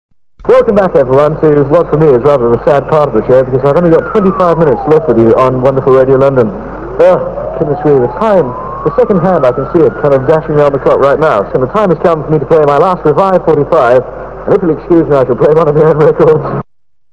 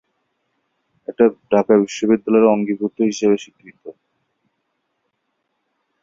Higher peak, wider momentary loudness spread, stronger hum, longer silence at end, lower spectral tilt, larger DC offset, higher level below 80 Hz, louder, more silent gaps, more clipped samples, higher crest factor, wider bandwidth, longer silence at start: about the same, 0 dBFS vs -2 dBFS; second, 5 LU vs 8 LU; neither; second, 0.5 s vs 2.1 s; first, -9 dB/octave vs -6 dB/octave; first, 0.6% vs under 0.1%; first, -32 dBFS vs -62 dBFS; first, -8 LUFS vs -17 LUFS; neither; first, 4% vs under 0.1%; second, 8 dB vs 18 dB; about the same, 7.8 kHz vs 7.8 kHz; second, 0.4 s vs 1.1 s